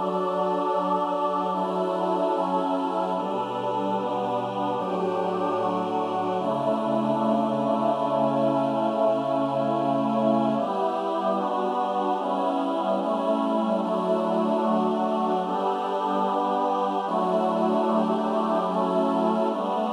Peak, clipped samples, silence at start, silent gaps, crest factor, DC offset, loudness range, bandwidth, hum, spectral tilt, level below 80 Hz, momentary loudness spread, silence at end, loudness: -10 dBFS; under 0.1%; 0 s; none; 14 dB; under 0.1%; 2 LU; 11 kHz; none; -7.5 dB/octave; -78 dBFS; 3 LU; 0 s; -25 LUFS